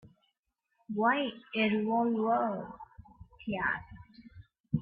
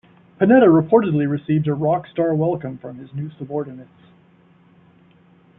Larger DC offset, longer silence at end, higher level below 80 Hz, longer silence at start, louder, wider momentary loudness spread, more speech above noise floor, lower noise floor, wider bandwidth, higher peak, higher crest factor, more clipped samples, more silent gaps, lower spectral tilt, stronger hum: neither; second, 0 s vs 1.75 s; second, -64 dBFS vs -58 dBFS; first, 0.9 s vs 0.4 s; second, -31 LUFS vs -18 LUFS; about the same, 21 LU vs 19 LU; first, 51 dB vs 35 dB; first, -82 dBFS vs -53 dBFS; first, 4.8 kHz vs 3.9 kHz; second, -16 dBFS vs -2 dBFS; about the same, 18 dB vs 18 dB; neither; first, 4.60-4.64 s vs none; second, -9.5 dB/octave vs -12.5 dB/octave; neither